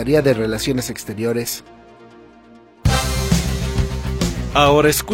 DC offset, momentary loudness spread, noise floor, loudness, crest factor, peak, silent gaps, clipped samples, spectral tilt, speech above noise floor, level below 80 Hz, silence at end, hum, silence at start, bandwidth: under 0.1%; 10 LU; -46 dBFS; -19 LUFS; 18 dB; 0 dBFS; none; under 0.1%; -5 dB/octave; 28 dB; -28 dBFS; 0 s; none; 0 s; 16.5 kHz